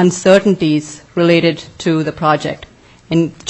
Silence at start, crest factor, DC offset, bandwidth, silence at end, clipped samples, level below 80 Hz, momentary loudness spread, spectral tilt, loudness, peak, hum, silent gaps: 0 s; 14 dB; under 0.1%; 9.6 kHz; 0 s; under 0.1%; -50 dBFS; 11 LU; -5.5 dB/octave; -14 LUFS; 0 dBFS; none; none